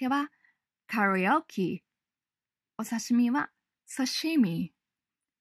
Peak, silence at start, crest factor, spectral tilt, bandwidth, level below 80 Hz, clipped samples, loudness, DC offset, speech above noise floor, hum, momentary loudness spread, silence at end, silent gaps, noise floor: -12 dBFS; 0 s; 18 dB; -4.5 dB/octave; 14 kHz; -78 dBFS; under 0.1%; -29 LUFS; under 0.1%; over 62 dB; none; 14 LU; 0.75 s; none; under -90 dBFS